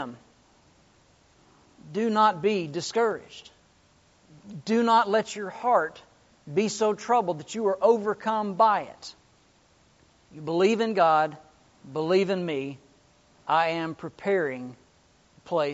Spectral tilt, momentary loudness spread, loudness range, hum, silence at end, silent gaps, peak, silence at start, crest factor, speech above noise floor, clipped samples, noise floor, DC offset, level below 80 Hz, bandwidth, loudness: -4 dB/octave; 17 LU; 3 LU; none; 0 s; none; -8 dBFS; 0 s; 20 dB; 36 dB; under 0.1%; -61 dBFS; under 0.1%; -70 dBFS; 8 kHz; -25 LUFS